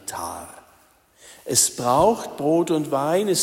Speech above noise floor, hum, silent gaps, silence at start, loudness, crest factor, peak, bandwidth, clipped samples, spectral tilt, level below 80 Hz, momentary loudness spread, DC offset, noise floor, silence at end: 36 dB; none; none; 0.05 s; -21 LUFS; 18 dB; -4 dBFS; 16.5 kHz; under 0.1%; -3.5 dB/octave; -54 dBFS; 17 LU; under 0.1%; -57 dBFS; 0 s